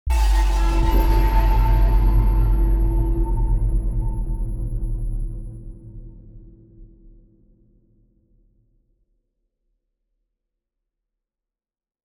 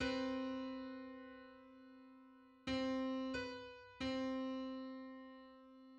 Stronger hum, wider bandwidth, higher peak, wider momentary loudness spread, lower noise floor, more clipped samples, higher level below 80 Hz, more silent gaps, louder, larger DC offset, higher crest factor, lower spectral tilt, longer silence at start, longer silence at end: neither; first, 12.5 kHz vs 8.6 kHz; first, -6 dBFS vs -28 dBFS; second, 17 LU vs 20 LU; first, under -90 dBFS vs -64 dBFS; neither; first, -22 dBFS vs -68 dBFS; neither; first, -22 LUFS vs -45 LUFS; neither; about the same, 14 dB vs 18 dB; first, -7 dB/octave vs -5 dB/octave; about the same, 0.05 s vs 0 s; first, 5.2 s vs 0 s